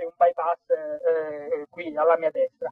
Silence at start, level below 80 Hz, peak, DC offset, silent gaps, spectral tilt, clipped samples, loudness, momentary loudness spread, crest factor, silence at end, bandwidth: 0 s; -76 dBFS; -8 dBFS; under 0.1%; none; -7 dB/octave; under 0.1%; -25 LUFS; 9 LU; 16 dB; 0 s; 4.2 kHz